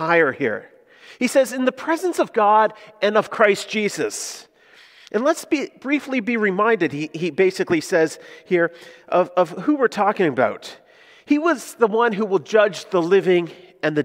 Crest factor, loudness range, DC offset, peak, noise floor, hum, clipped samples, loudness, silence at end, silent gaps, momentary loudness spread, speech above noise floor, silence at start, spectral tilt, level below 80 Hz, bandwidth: 20 dB; 3 LU; under 0.1%; 0 dBFS; -50 dBFS; none; under 0.1%; -20 LUFS; 0 s; none; 8 LU; 31 dB; 0 s; -4.5 dB/octave; -70 dBFS; 16 kHz